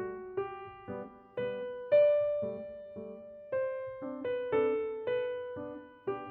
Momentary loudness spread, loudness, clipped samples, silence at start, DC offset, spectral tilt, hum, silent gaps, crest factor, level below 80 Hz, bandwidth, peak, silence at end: 18 LU; -34 LUFS; under 0.1%; 0 s; under 0.1%; -4.5 dB/octave; none; none; 18 dB; -70 dBFS; 4.5 kHz; -16 dBFS; 0 s